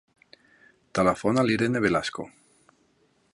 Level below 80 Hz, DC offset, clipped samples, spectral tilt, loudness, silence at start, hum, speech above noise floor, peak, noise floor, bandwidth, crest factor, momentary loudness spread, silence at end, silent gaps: -56 dBFS; under 0.1%; under 0.1%; -5.5 dB/octave; -25 LUFS; 0.95 s; none; 42 dB; -8 dBFS; -66 dBFS; 11.5 kHz; 20 dB; 13 LU; 1.05 s; none